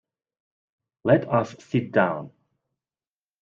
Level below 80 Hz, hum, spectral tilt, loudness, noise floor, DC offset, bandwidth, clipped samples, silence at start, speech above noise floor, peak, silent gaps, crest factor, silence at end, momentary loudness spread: -66 dBFS; none; -8 dB/octave; -23 LUFS; under -90 dBFS; under 0.1%; 7.6 kHz; under 0.1%; 1.05 s; over 67 dB; -4 dBFS; none; 24 dB; 1.15 s; 9 LU